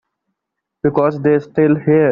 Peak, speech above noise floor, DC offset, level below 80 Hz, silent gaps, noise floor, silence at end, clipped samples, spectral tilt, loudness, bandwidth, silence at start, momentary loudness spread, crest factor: -2 dBFS; 65 dB; under 0.1%; -54 dBFS; none; -79 dBFS; 0 s; under 0.1%; -9 dB/octave; -15 LUFS; 5.4 kHz; 0.85 s; 5 LU; 14 dB